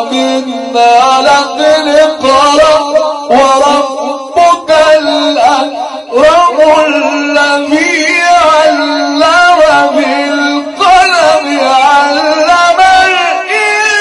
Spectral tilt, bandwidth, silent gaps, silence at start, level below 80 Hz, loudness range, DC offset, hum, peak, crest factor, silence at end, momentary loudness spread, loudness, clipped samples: -2 dB/octave; 12 kHz; none; 0 s; -42 dBFS; 1 LU; under 0.1%; none; 0 dBFS; 8 dB; 0 s; 6 LU; -7 LUFS; 2%